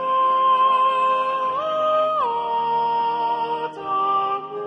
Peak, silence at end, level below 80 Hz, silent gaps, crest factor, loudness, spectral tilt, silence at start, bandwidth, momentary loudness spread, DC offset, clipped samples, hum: -10 dBFS; 0 s; -72 dBFS; none; 10 dB; -20 LUFS; -4.5 dB/octave; 0 s; 8.2 kHz; 7 LU; under 0.1%; under 0.1%; none